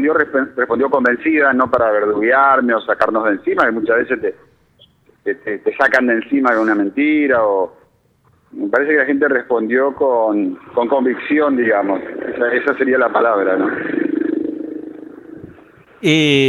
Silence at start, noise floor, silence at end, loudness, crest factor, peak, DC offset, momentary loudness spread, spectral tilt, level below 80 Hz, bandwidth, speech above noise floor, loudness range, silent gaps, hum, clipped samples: 0 s; -56 dBFS; 0 s; -16 LUFS; 14 dB; -2 dBFS; under 0.1%; 10 LU; -6 dB/octave; -60 dBFS; 11.5 kHz; 41 dB; 3 LU; none; none; under 0.1%